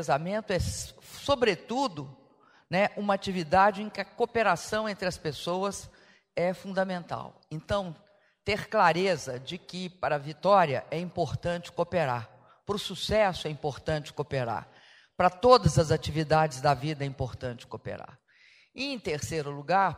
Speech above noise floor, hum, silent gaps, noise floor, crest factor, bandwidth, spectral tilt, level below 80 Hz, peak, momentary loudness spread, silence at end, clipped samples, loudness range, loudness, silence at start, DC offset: 32 dB; none; none; -60 dBFS; 24 dB; 15.5 kHz; -5 dB/octave; -52 dBFS; -4 dBFS; 15 LU; 0 s; under 0.1%; 6 LU; -29 LUFS; 0 s; under 0.1%